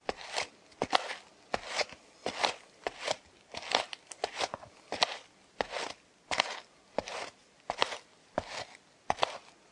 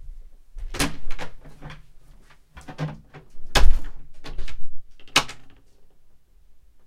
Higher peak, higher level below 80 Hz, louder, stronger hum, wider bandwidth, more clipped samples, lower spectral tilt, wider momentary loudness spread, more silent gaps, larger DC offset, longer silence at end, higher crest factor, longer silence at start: about the same, -4 dBFS vs -2 dBFS; second, -66 dBFS vs -28 dBFS; second, -36 LUFS vs -27 LUFS; neither; second, 11.5 kHz vs 13 kHz; neither; second, -1.5 dB/octave vs -3 dB/octave; second, 13 LU vs 26 LU; neither; neither; second, 0.2 s vs 1.35 s; first, 32 dB vs 20 dB; about the same, 0.05 s vs 0.05 s